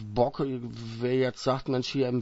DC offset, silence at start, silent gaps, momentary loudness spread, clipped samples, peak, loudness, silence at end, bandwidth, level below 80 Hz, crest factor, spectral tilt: under 0.1%; 0 s; none; 7 LU; under 0.1%; -10 dBFS; -29 LUFS; 0 s; 8 kHz; -54 dBFS; 18 dB; -6.5 dB/octave